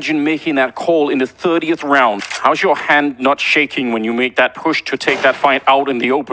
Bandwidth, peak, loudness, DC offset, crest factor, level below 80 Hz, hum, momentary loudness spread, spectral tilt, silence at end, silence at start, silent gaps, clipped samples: 8 kHz; 0 dBFS; -14 LUFS; under 0.1%; 14 dB; -60 dBFS; none; 4 LU; -4 dB/octave; 0 s; 0 s; none; under 0.1%